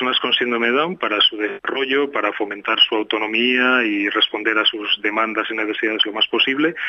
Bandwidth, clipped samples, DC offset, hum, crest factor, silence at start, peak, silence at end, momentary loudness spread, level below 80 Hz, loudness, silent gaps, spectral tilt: 6.6 kHz; under 0.1%; under 0.1%; none; 16 dB; 0 s; -2 dBFS; 0 s; 6 LU; -68 dBFS; -18 LUFS; none; -4.5 dB/octave